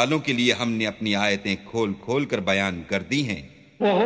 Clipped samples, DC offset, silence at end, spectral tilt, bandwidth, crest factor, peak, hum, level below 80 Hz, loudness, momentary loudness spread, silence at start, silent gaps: under 0.1%; under 0.1%; 0 s; -4.5 dB/octave; 8 kHz; 18 dB; -6 dBFS; none; -54 dBFS; -24 LUFS; 6 LU; 0 s; none